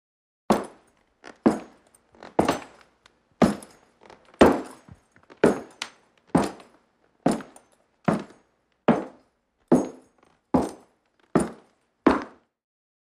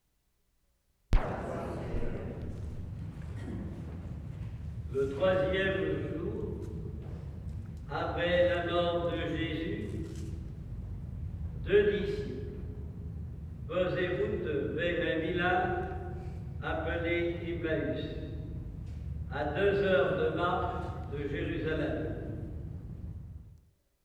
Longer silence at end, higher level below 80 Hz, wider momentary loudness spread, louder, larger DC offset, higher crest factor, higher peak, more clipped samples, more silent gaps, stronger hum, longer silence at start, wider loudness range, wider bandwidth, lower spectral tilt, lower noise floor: first, 0.9 s vs 0.45 s; second, -52 dBFS vs -42 dBFS; about the same, 15 LU vs 14 LU; first, -25 LUFS vs -34 LUFS; neither; first, 26 dB vs 20 dB; first, -2 dBFS vs -14 dBFS; neither; neither; neither; second, 0.5 s vs 1.1 s; about the same, 4 LU vs 6 LU; first, 15 kHz vs 11 kHz; second, -6 dB/octave vs -7.5 dB/octave; second, -68 dBFS vs -74 dBFS